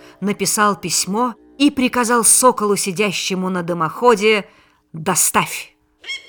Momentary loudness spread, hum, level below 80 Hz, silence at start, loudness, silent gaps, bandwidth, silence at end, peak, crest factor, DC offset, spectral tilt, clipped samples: 12 LU; none; -56 dBFS; 0.2 s; -16 LUFS; none; over 20 kHz; 0.1 s; 0 dBFS; 18 dB; under 0.1%; -3 dB/octave; under 0.1%